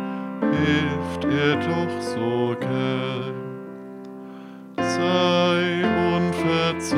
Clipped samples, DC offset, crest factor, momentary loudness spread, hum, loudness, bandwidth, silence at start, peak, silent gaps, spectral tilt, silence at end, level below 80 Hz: under 0.1%; under 0.1%; 16 dB; 18 LU; none; -22 LUFS; 13 kHz; 0 s; -6 dBFS; none; -6 dB/octave; 0 s; -54 dBFS